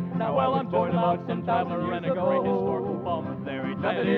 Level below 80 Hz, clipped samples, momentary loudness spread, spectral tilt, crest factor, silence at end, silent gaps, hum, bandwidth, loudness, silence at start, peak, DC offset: -62 dBFS; under 0.1%; 6 LU; -9.5 dB/octave; 14 dB; 0 s; none; none; 4.8 kHz; -26 LUFS; 0 s; -12 dBFS; under 0.1%